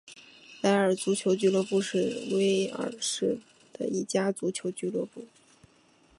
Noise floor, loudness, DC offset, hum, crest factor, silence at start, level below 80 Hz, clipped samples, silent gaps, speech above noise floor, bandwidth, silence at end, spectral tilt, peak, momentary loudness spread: -62 dBFS; -28 LUFS; under 0.1%; none; 18 dB; 0.05 s; -76 dBFS; under 0.1%; none; 34 dB; 11.5 kHz; 0.95 s; -4.5 dB/octave; -12 dBFS; 12 LU